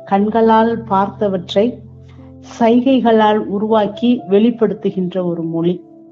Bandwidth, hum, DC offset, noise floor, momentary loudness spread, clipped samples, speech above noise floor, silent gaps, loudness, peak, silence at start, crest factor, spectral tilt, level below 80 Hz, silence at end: 7.2 kHz; none; under 0.1%; -37 dBFS; 8 LU; under 0.1%; 23 dB; none; -15 LUFS; 0 dBFS; 0 s; 14 dB; -5.5 dB/octave; -54 dBFS; 0.35 s